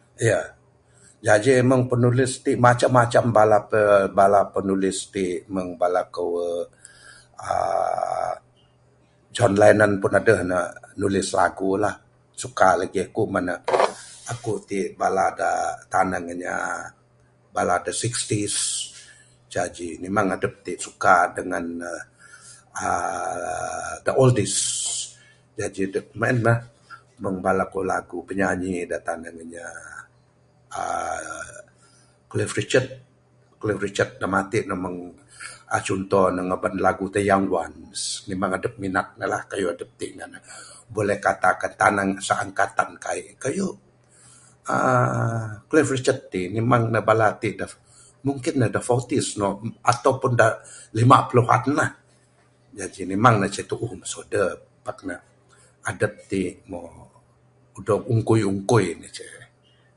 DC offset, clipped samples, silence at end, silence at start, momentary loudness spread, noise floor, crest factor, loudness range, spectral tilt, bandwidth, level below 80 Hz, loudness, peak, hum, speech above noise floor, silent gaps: under 0.1%; under 0.1%; 0.5 s; 0.2 s; 17 LU; -59 dBFS; 22 dB; 8 LU; -5 dB/octave; 11.5 kHz; -52 dBFS; -22 LUFS; 0 dBFS; none; 36 dB; none